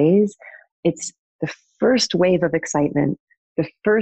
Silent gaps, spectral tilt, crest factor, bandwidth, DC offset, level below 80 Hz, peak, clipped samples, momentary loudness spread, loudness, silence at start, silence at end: 0.72-0.83 s, 1.19-1.39 s, 3.20-3.27 s, 3.37-3.55 s; -5 dB/octave; 14 dB; 9 kHz; under 0.1%; -56 dBFS; -6 dBFS; under 0.1%; 13 LU; -21 LUFS; 0 s; 0 s